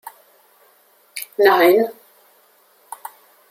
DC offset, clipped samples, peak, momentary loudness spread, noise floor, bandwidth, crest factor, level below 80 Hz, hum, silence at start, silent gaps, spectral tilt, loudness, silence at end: under 0.1%; under 0.1%; -2 dBFS; 25 LU; -55 dBFS; 16 kHz; 20 dB; -74 dBFS; none; 0.05 s; none; -3.5 dB/octave; -16 LUFS; 1.6 s